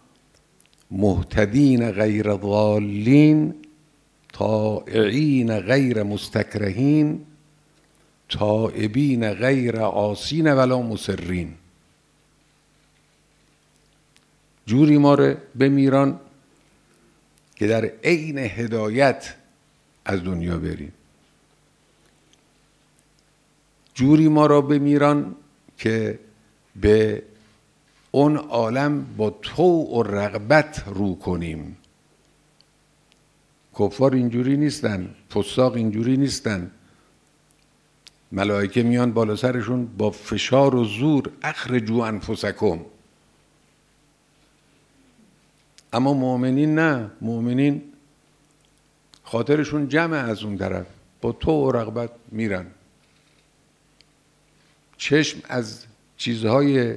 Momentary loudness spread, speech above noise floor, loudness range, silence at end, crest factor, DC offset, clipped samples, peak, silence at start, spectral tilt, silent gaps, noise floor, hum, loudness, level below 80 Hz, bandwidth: 12 LU; 41 dB; 8 LU; 0 s; 22 dB; under 0.1%; under 0.1%; 0 dBFS; 0.9 s; -7 dB/octave; none; -61 dBFS; none; -21 LUFS; -48 dBFS; 11 kHz